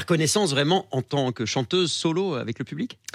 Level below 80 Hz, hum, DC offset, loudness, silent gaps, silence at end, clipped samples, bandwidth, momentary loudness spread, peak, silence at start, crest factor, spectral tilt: -68 dBFS; none; under 0.1%; -24 LUFS; none; 0.2 s; under 0.1%; 15 kHz; 10 LU; -8 dBFS; 0 s; 16 dB; -4.5 dB/octave